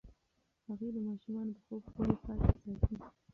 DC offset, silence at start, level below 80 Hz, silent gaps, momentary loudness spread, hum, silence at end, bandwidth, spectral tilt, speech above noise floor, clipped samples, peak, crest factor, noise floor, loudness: under 0.1%; 0.05 s; -42 dBFS; none; 13 LU; none; 0.25 s; 6.2 kHz; -11 dB/octave; 43 dB; under 0.1%; -14 dBFS; 24 dB; -80 dBFS; -38 LUFS